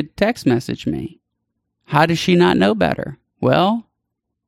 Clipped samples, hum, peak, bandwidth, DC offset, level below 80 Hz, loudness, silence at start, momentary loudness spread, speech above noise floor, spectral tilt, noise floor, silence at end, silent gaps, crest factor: under 0.1%; none; -2 dBFS; 14 kHz; under 0.1%; -48 dBFS; -18 LUFS; 0 s; 12 LU; 60 dB; -6 dB/octave; -77 dBFS; 0.65 s; none; 18 dB